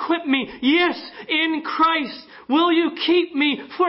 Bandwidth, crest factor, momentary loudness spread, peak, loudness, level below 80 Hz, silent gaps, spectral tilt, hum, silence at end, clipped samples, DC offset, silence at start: 5.8 kHz; 16 dB; 6 LU; -4 dBFS; -20 LUFS; -64 dBFS; none; -7.5 dB/octave; none; 0 s; under 0.1%; under 0.1%; 0 s